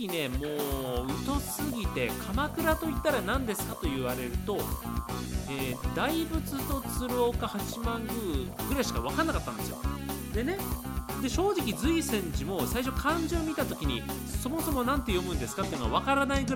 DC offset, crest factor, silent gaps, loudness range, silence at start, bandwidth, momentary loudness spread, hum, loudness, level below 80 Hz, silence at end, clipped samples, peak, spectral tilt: under 0.1%; 18 dB; none; 2 LU; 0 s; 17 kHz; 6 LU; none; -31 LUFS; -38 dBFS; 0 s; under 0.1%; -12 dBFS; -5 dB/octave